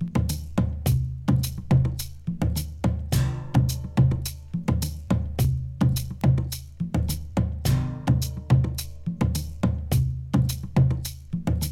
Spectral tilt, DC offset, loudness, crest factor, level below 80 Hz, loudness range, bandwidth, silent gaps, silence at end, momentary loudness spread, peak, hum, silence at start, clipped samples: -6.5 dB/octave; under 0.1%; -26 LUFS; 18 dB; -34 dBFS; 1 LU; 16.5 kHz; none; 0 s; 7 LU; -6 dBFS; none; 0 s; under 0.1%